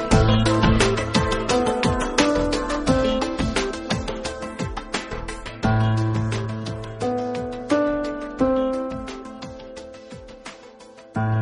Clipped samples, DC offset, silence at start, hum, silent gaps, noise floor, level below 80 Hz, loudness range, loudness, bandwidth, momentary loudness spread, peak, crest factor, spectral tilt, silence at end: under 0.1%; under 0.1%; 0 s; none; none; -44 dBFS; -34 dBFS; 6 LU; -23 LUFS; 10.5 kHz; 19 LU; -2 dBFS; 20 dB; -5.5 dB/octave; 0 s